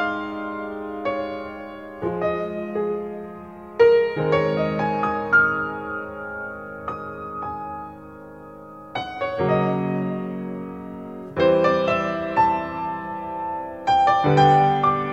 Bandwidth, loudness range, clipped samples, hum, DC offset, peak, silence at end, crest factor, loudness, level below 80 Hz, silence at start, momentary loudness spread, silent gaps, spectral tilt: 8 kHz; 8 LU; under 0.1%; none; 0.1%; -4 dBFS; 0 s; 18 dB; -22 LUFS; -52 dBFS; 0 s; 18 LU; none; -7.5 dB/octave